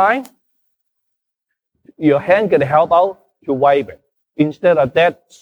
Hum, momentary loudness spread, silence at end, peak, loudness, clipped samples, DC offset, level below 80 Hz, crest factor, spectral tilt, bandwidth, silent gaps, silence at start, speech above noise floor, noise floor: none; 10 LU; 0.3 s; -2 dBFS; -15 LUFS; under 0.1%; under 0.1%; -56 dBFS; 16 dB; -7.5 dB/octave; 9.2 kHz; none; 0 s; 63 dB; -78 dBFS